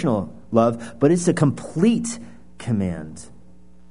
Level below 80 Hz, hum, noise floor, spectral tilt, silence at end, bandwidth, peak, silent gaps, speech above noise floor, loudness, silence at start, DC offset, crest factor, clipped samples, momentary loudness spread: -52 dBFS; none; -51 dBFS; -6.5 dB/octave; 0.65 s; 11 kHz; -2 dBFS; none; 30 dB; -21 LUFS; 0 s; 0.7%; 20 dB; under 0.1%; 17 LU